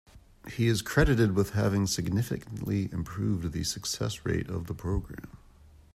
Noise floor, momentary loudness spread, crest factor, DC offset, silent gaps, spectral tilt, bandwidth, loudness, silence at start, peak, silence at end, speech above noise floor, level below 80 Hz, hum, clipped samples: -55 dBFS; 11 LU; 20 dB; under 0.1%; none; -5.5 dB/octave; 15 kHz; -29 LUFS; 0.15 s; -10 dBFS; 0.6 s; 26 dB; -42 dBFS; none; under 0.1%